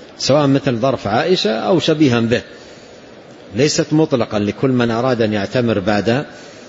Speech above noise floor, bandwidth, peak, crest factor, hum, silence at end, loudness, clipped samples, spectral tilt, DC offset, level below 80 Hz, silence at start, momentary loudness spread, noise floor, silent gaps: 23 dB; 8 kHz; -2 dBFS; 14 dB; none; 0 s; -16 LUFS; under 0.1%; -5.5 dB/octave; under 0.1%; -50 dBFS; 0 s; 5 LU; -39 dBFS; none